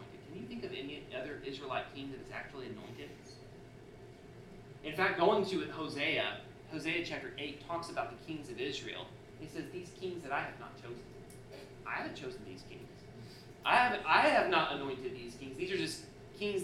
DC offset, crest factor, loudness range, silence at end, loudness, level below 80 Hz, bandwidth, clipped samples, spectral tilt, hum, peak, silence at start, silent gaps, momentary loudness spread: under 0.1%; 24 dB; 12 LU; 0 s; -36 LUFS; -64 dBFS; 15 kHz; under 0.1%; -4.5 dB/octave; none; -14 dBFS; 0 s; none; 23 LU